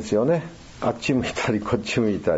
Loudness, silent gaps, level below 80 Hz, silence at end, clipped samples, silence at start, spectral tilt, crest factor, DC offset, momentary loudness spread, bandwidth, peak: -24 LUFS; none; -48 dBFS; 0 s; under 0.1%; 0 s; -6 dB/octave; 16 dB; under 0.1%; 6 LU; 8 kHz; -8 dBFS